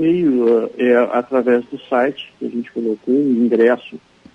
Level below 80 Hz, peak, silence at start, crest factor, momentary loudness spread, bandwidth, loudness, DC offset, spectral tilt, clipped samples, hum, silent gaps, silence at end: -62 dBFS; -2 dBFS; 0 s; 14 dB; 10 LU; 5.8 kHz; -17 LUFS; under 0.1%; -8 dB/octave; under 0.1%; none; none; 0.4 s